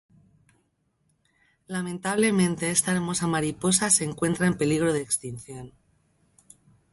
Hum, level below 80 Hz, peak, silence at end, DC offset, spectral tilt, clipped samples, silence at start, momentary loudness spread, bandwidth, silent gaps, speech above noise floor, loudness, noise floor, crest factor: none; -58 dBFS; -4 dBFS; 1.25 s; under 0.1%; -4 dB/octave; under 0.1%; 1.7 s; 13 LU; 12 kHz; none; 46 dB; -24 LUFS; -71 dBFS; 22 dB